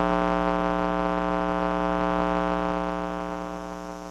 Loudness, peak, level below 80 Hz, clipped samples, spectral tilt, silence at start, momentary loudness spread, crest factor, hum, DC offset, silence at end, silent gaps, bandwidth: -26 LUFS; -8 dBFS; -42 dBFS; under 0.1%; -7 dB/octave; 0 s; 9 LU; 18 dB; none; under 0.1%; 0 s; none; 10.5 kHz